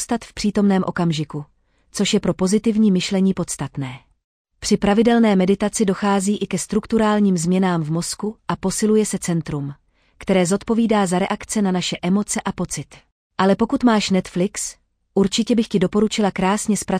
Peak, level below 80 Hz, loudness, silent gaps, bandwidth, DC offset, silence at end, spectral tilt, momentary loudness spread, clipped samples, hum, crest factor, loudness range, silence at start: -4 dBFS; -46 dBFS; -19 LUFS; 4.24-4.45 s, 13.12-13.30 s; 14.5 kHz; under 0.1%; 0 s; -5 dB/octave; 10 LU; under 0.1%; none; 14 dB; 3 LU; 0 s